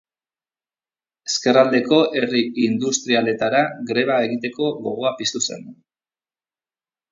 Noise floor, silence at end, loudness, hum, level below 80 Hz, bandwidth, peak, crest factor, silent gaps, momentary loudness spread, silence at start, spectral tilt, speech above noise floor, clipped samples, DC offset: under -90 dBFS; 1.4 s; -19 LUFS; none; -68 dBFS; 7.8 kHz; -2 dBFS; 20 dB; none; 8 LU; 1.25 s; -3.5 dB/octave; over 71 dB; under 0.1%; under 0.1%